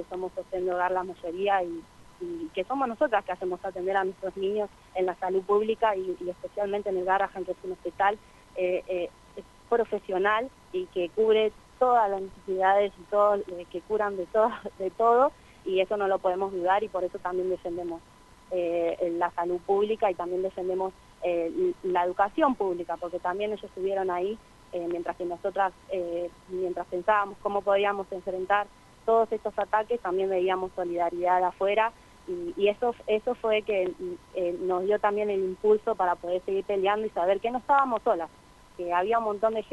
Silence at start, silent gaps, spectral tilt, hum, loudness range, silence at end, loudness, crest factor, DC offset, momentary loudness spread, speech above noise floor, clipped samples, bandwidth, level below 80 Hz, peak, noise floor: 0 s; none; -6 dB/octave; none; 4 LU; 0.1 s; -28 LUFS; 18 dB; under 0.1%; 11 LU; 19 dB; under 0.1%; 12 kHz; -60 dBFS; -10 dBFS; -47 dBFS